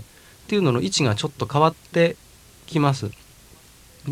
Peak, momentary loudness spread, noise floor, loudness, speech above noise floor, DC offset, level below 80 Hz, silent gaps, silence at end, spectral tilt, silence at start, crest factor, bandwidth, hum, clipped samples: -2 dBFS; 10 LU; -50 dBFS; -22 LUFS; 29 dB; under 0.1%; -54 dBFS; none; 0 s; -5.5 dB/octave; 0 s; 22 dB; 15 kHz; none; under 0.1%